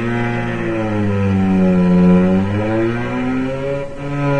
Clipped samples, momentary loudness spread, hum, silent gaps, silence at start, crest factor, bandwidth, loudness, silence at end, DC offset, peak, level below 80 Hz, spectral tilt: under 0.1%; 9 LU; none; none; 0 s; 14 dB; 8.4 kHz; -16 LUFS; 0 s; under 0.1%; -2 dBFS; -36 dBFS; -9 dB/octave